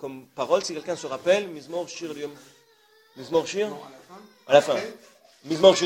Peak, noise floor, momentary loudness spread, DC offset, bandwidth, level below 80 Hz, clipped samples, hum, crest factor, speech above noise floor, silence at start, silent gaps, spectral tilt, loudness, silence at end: -2 dBFS; -59 dBFS; 19 LU; under 0.1%; 14 kHz; -70 dBFS; under 0.1%; none; 22 dB; 35 dB; 0 s; none; -3.5 dB/octave; -25 LUFS; 0 s